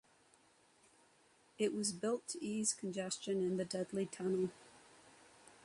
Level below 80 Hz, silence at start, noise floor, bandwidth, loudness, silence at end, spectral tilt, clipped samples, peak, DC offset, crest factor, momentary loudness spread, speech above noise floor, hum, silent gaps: -80 dBFS; 1.6 s; -70 dBFS; 11.5 kHz; -39 LUFS; 0.1 s; -4 dB/octave; under 0.1%; -22 dBFS; under 0.1%; 20 dB; 15 LU; 31 dB; none; none